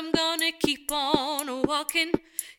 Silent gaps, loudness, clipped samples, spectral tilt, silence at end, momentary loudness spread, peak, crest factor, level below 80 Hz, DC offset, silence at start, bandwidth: none; -26 LUFS; under 0.1%; -2.5 dB/octave; 0.05 s; 3 LU; -6 dBFS; 20 dB; -56 dBFS; under 0.1%; 0 s; 19 kHz